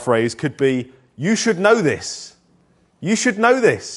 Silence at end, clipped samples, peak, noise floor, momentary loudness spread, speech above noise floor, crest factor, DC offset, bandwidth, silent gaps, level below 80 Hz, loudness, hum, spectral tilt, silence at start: 0 s; under 0.1%; 0 dBFS; -58 dBFS; 14 LU; 40 dB; 18 dB; under 0.1%; 11.5 kHz; none; -60 dBFS; -18 LUFS; none; -4.5 dB/octave; 0 s